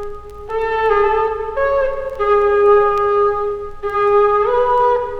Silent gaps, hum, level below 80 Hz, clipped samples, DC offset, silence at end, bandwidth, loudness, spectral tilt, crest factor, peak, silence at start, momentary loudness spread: none; none; -36 dBFS; under 0.1%; under 0.1%; 0 s; 6 kHz; -16 LUFS; -6 dB/octave; 14 dB; -2 dBFS; 0 s; 10 LU